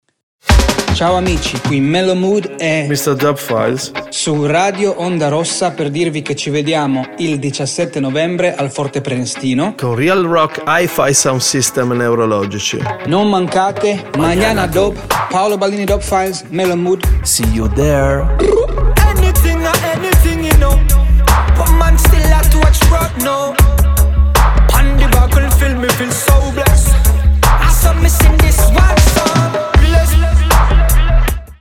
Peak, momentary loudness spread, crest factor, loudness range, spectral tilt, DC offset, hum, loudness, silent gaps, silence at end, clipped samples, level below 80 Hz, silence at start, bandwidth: 0 dBFS; 7 LU; 12 dB; 5 LU; -5 dB/octave; under 0.1%; none; -13 LUFS; none; 0.05 s; under 0.1%; -14 dBFS; 0.45 s; 17 kHz